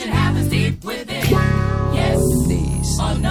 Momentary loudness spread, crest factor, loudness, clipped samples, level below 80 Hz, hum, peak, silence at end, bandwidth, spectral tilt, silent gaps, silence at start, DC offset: 5 LU; 14 dB; -19 LUFS; under 0.1%; -26 dBFS; none; -4 dBFS; 0 s; 17.5 kHz; -5.5 dB/octave; none; 0 s; under 0.1%